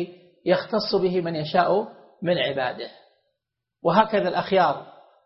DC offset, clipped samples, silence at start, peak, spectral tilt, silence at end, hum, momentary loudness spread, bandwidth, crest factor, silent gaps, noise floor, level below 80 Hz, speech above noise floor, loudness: under 0.1%; under 0.1%; 0 s; -6 dBFS; -9 dB/octave; 0.35 s; none; 13 LU; 5.8 kHz; 18 dB; none; -83 dBFS; -66 dBFS; 61 dB; -23 LUFS